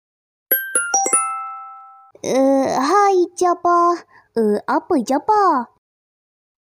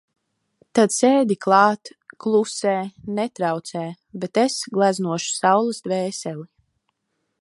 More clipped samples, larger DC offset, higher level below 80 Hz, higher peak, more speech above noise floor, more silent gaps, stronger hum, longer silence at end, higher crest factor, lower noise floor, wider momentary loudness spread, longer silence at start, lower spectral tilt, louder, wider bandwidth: neither; neither; about the same, -66 dBFS vs -68 dBFS; about the same, -4 dBFS vs -2 dBFS; second, 26 dB vs 55 dB; neither; neither; about the same, 1.05 s vs 0.95 s; about the same, 16 dB vs 20 dB; second, -43 dBFS vs -75 dBFS; about the same, 13 LU vs 14 LU; second, 0.5 s vs 0.75 s; second, -3 dB/octave vs -4.5 dB/octave; first, -17 LUFS vs -21 LUFS; first, 16 kHz vs 11.5 kHz